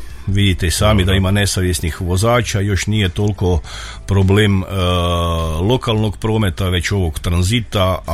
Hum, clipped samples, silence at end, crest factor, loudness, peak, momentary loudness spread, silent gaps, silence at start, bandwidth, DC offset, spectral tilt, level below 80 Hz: none; under 0.1%; 0 s; 14 dB; -16 LUFS; -2 dBFS; 5 LU; none; 0 s; 15 kHz; under 0.1%; -5.5 dB/octave; -28 dBFS